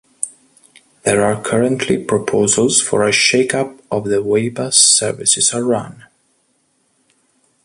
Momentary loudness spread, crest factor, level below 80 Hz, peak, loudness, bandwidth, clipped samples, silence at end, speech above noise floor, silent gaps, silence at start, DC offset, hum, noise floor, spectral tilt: 11 LU; 18 dB; -54 dBFS; 0 dBFS; -14 LUFS; 11.5 kHz; under 0.1%; 1.65 s; 47 dB; none; 0.2 s; under 0.1%; none; -62 dBFS; -2.5 dB/octave